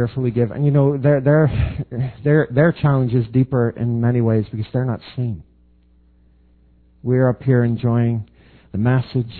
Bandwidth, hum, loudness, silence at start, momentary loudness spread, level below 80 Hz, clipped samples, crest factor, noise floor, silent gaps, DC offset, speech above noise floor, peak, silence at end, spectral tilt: 4.5 kHz; none; -18 LUFS; 0 s; 10 LU; -40 dBFS; under 0.1%; 16 dB; -53 dBFS; none; under 0.1%; 36 dB; -2 dBFS; 0 s; -12.5 dB/octave